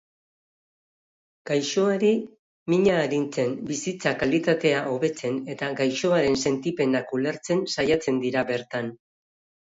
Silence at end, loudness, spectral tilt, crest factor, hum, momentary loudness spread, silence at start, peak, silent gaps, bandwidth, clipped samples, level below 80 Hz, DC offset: 0.75 s; -24 LUFS; -5 dB/octave; 18 dB; none; 8 LU; 1.45 s; -8 dBFS; 2.39-2.66 s; 8 kHz; under 0.1%; -60 dBFS; under 0.1%